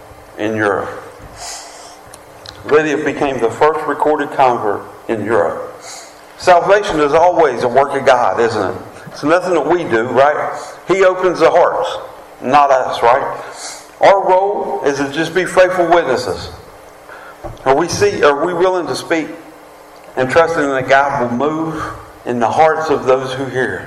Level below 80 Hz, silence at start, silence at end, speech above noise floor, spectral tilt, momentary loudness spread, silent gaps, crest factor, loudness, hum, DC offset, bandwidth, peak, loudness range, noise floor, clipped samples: -46 dBFS; 0 s; 0 s; 25 dB; -4.5 dB/octave; 18 LU; none; 14 dB; -14 LUFS; none; under 0.1%; 14 kHz; 0 dBFS; 3 LU; -38 dBFS; under 0.1%